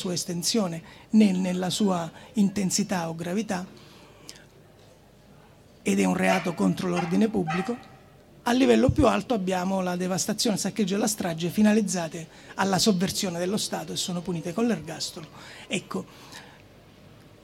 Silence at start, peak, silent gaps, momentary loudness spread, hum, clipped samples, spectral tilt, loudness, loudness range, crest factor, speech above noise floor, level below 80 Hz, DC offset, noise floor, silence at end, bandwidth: 0 s; -6 dBFS; none; 16 LU; none; under 0.1%; -4.5 dB/octave; -26 LUFS; 7 LU; 20 dB; 28 dB; -52 dBFS; under 0.1%; -53 dBFS; 0.95 s; 16.5 kHz